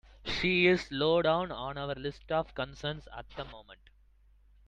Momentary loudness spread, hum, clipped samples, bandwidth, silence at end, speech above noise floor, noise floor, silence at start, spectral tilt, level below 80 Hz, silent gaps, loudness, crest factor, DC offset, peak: 18 LU; none; under 0.1%; 8.8 kHz; 0.95 s; 31 dB; -62 dBFS; 0.25 s; -6 dB/octave; -54 dBFS; none; -30 LUFS; 20 dB; under 0.1%; -12 dBFS